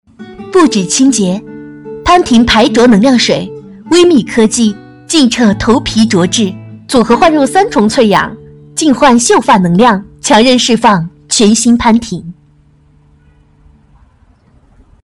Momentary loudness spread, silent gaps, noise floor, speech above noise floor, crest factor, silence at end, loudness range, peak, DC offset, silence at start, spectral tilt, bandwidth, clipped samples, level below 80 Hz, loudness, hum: 14 LU; none; -46 dBFS; 38 dB; 10 dB; 2.7 s; 4 LU; 0 dBFS; under 0.1%; 0.2 s; -4 dB/octave; 12 kHz; under 0.1%; -36 dBFS; -9 LUFS; none